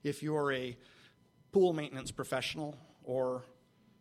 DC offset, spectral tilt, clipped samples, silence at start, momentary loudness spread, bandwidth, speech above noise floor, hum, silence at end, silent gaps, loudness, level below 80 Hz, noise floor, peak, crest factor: under 0.1%; -5.5 dB/octave; under 0.1%; 0.05 s; 14 LU; 14.5 kHz; 31 dB; none; 0.55 s; none; -35 LUFS; -68 dBFS; -65 dBFS; -18 dBFS; 20 dB